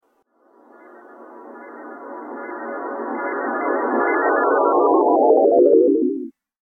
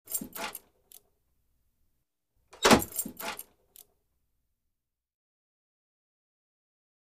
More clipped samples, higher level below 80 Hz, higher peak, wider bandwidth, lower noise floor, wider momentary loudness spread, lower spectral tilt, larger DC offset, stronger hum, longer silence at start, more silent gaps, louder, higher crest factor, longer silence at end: neither; second, -72 dBFS vs -58 dBFS; about the same, -4 dBFS vs -6 dBFS; second, 2.3 kHz vs 15.5 kHz; second, -61 dBFS vs -85 dBFS; first, 23 LU vs 19 LU; first, -10 dB/octave vs -3 dB/octave; neither; neither; first, 1.2 s vs 0.1 s; neither; first, -18 LUFS vs -28 LUFS; second, 16 dB vs 28 dB; second, 0.45 s vs 3.75 s